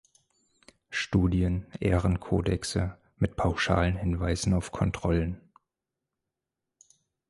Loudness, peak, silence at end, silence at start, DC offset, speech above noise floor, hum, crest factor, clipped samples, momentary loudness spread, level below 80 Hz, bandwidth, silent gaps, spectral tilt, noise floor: -28 LUFS; -10 dBFS; 1.9 s; 0.9 s; under 0.1%; 60 dB; none; 20 dB; under 0.1%; 7 LU; -38 dBFS; 11.5 kHz; none; -6 dB/octave; -87 dBFS